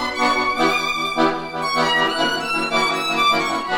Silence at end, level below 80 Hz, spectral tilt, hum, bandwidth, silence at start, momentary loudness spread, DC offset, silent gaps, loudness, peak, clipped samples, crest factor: 0 s; -50 dBFS; -3 dB/octave; none; 18 kHz; 0 s; 4 LU; under 0.1%; none; -18 LUFS; -4 dBFS; under 0.1%; 16 dB